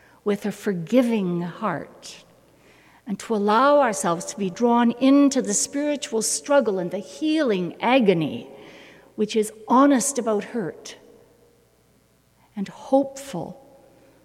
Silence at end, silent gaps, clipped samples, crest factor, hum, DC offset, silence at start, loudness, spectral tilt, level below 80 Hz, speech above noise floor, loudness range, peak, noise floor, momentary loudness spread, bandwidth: 0.7 s; none; under 0.1%; 18 dB; none; under 0.1%; 0.25 s; -22 LUFS; -4.5 dB/octave; -68 dBFS; 38 dB; 8 LU; -6 dBFS; -60 dBFS; 16 LU; 15.5 kHz